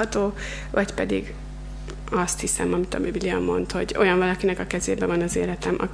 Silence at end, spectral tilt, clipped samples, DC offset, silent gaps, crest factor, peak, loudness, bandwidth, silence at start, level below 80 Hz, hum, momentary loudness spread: 0 s; -4.5 dB/octave; under 0.1%; under 0.1%; none; 20 dB; -6 dBFS; -24 LUFS; 11 kHz; 0 s; -38 dBFS; none; 14 LU